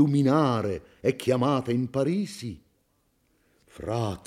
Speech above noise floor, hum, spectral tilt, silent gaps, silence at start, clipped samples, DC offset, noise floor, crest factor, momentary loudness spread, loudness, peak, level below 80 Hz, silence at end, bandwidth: 45 dB; none; -7 dB/octave; none; 0 s; under 0.1%; under 0.1%; -70 dBFS; 18 dB; 16 LU; -26 LUFS; -8 dBFS; -60 dBFS; 0.05 s; 14 kHz